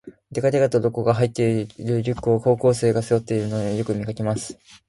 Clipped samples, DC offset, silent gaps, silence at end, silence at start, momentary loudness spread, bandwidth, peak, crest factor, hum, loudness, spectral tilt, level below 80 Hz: under 0.1%; under 0.1%; none; 0.15 s; 0.05 s; 7 LU; 11.5 kHz; -4 dBFS; 16 dB; none; -22 LUFS; -7 dB/octave; -52 dBFS